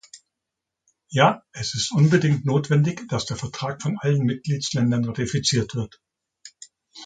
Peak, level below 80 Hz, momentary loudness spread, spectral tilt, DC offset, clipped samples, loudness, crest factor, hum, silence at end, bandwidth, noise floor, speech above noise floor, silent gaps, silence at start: -2 dBFS; -54 dBFS; 11 LU; -5.5 dB/octave; under 0.1%; under 0.1%; -22 LUFS; 20 dB; none; 0 s; 9.4 kHz; -84 dBFS; 62 dB; none; 0.15 s